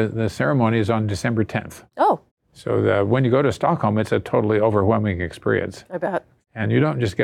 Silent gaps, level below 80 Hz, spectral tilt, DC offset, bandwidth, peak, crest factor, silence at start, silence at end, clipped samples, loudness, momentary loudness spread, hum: 2.31-2.37 s; -54 dBFS; -7.5 dB/octave; under 0.1%; 12.5 kHz; -6 dBFS; 14 dB; 0 s; 0 s; under 0.1%; -21 LUFS; 10 LU; none